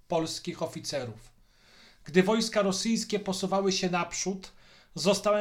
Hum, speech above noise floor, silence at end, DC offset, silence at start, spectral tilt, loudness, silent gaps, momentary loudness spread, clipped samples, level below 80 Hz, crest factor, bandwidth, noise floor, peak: none; 30 dB; 0 s; under 0.1%; 0.1 s; -4 dB/octave; -29 LUFS; none; 11 LU; under 0.1%; -60 dBFS; 20 dB; 16 kHz; -58 dBFS; -10 dBFS